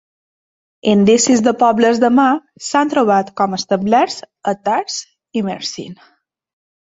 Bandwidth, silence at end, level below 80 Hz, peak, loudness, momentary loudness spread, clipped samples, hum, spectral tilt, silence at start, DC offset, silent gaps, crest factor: 8 kHz; 0.9 s; -58 dBFS; -2 dBFS; -15 LUFS; 13 LU; under 0.1%; none; -4.5 dB/octave; 0.85 s; under 0.1%; none; 14 dB